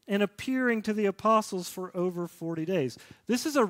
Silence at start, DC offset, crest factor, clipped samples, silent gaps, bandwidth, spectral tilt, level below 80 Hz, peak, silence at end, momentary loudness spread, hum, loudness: 0.1 s; under 0.1%; 18 dB; under 0.1%; none; 16 kHz; -5 dB/octave; -70 dBFS; -12 dBFS; 0 s; 10 LU; none; -29 LUFS